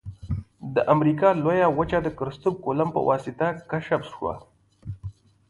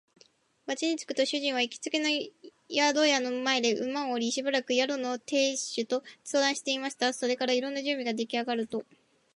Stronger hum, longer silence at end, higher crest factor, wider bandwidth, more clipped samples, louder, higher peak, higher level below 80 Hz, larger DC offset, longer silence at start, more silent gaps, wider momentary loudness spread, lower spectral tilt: neither; second, 0.4 s vs 0.55 s; about the same, 20 dB vs 18 dB; about the same, 11.5 kHz vs 11.5 kHz; neither; first, -24 LUFS vs -29 LUFS; first, -6 dBFS vs -12 dBFS; first, -48 dBFS vs -82 dBFS; neither; second, 0.05 s vs 0.65 s; neither; first, 18 LU vs 7 LU; first, -8.5 dB/octave vs -1.5 dB/octave